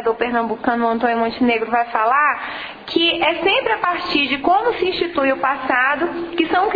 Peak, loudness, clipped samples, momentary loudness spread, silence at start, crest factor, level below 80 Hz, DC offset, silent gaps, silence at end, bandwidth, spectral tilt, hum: -2 dBFS; -18 LUFS; under 0.1%; 5 LU; 0 s; 16 dB; -52 dBFS; under 0.1%; none; 0 s; 5 kHz; -6 dB/octave; none